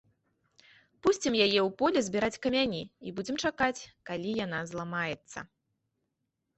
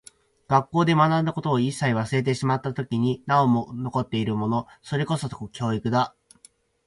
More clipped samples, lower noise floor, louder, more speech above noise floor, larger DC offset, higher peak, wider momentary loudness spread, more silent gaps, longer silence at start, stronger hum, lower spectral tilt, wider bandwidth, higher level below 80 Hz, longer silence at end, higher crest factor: neither; first, -83 dBFS vs -57 dBFS; second, -30 LUFS vs -24 LUFS; first, 52 dB vs 34 dB; neither; second, -12 dBFS vs -6 dBFS; first, 14 LU vs 8 LU; neither; first, 1.05 s vs 0.5 s; neither; second, -4 dB/octave vs -6.5 dB/octave; second, 8.4 kHz vs 11.5 kHz; second, -64 dBFS vs -58 dBFS; first, 1.15 s vs 0.8 s; about the same, 20 dB vs 18 dB